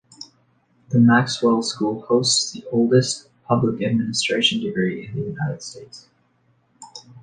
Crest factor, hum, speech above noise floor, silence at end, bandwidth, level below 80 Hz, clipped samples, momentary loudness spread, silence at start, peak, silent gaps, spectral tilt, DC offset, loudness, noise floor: 18 dB; none; 43 dB; 0.05 s; 10 kHz; -60 dBFS; under 0.1%; 23 LU; 0.2 s; -4 dBFS; none; -4.5 dB/octave; under 0.1%; -20 LUFS; -63 dBFS